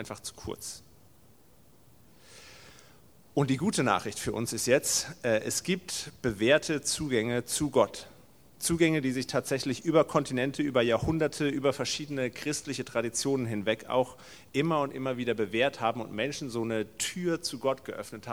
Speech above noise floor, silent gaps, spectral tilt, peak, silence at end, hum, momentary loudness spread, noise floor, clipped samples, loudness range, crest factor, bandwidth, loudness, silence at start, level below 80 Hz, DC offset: 31 dB; none; -4 dB/octave; -8 dBFS; 0 s; none; 10 LU; -61 dBFS; under 0.1%; 5 LU; 22 dB; over 20 kHz; -29 LUFS; 0 s; -58 dBFS; 0.1%